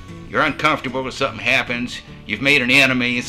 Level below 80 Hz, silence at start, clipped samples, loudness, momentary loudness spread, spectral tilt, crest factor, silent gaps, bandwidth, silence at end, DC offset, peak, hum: -44 dBFS; 0 s; under 0.1%; -17 LUFS; 13 LU; -4 dB/octave; 18 dB; none; 16 kHz; 0 s; under 0.1%; -2 dBFS; none